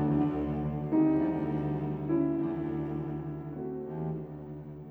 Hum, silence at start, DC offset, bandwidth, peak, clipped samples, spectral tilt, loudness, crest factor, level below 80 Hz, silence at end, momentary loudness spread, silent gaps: none; 0 s; under 0.1%; 3.8 kHz; -16 dBFS; under 0.1%; -11.5 dB/octave; -32 LUFS; 14 dB; -52 dBFS; 0 s; 12 LU; none